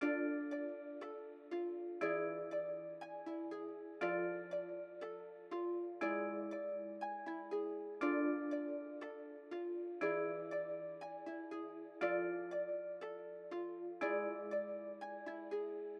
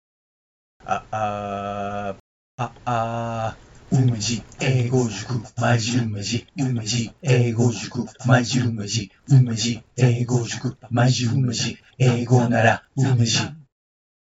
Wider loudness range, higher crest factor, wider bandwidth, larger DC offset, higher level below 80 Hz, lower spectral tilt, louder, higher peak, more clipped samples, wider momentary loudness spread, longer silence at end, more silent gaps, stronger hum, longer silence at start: about the same, 3 LU vs 5 LU; about the same, 16 dB vs 20 dB; second, 7 kHz vs 8 kHz; neither; second, under -90 dBFS vs -54 dBFS; first, -7 dB/octave vs -5.5 dB/octave; second, -43 LUFS vs -22 LUFS; second, -26 dBFS vs -2 dBFS; neither; about the same, 10 LU vs 11 LU; second, 0 s vs 0.75 s; second, none vs 2.20-2.58 s; neither; second, 0 s vs 0.85 s